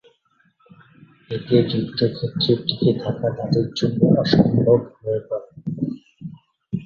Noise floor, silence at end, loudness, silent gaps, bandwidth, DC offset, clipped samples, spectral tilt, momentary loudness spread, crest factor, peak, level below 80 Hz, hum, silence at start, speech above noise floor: -62 dBFS; 0 s; -21 LUFS; none; 7.2 kHz; under 0.1%; under 0.1%; -8 dB/octave; 15 LU; 20 dB; -2 dBFS; -52 dBFS; none; 1.3 s; 43 dB